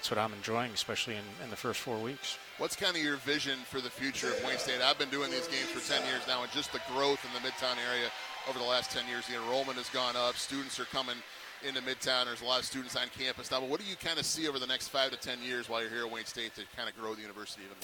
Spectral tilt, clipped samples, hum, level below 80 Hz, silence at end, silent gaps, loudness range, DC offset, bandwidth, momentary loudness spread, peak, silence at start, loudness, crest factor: -2 dB/octave; under 0.1%; none; -70 dBFS; 0 s; none; 3 LU; under 0.1%; 19 kHz; 8 LU; -10 dBFS; 0 s; -34 LUFS; 26 dB